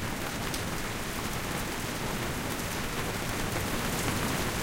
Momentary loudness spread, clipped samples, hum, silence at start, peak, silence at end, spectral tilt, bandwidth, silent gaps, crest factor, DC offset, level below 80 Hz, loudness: 4 LU; under 0.1%; none; 0 s; -10 dBFS; 0 s; -3.5 dB/octave; 17 kHz; none; 22 dB; under 0.1%; -42 dBFS; -32 LUFS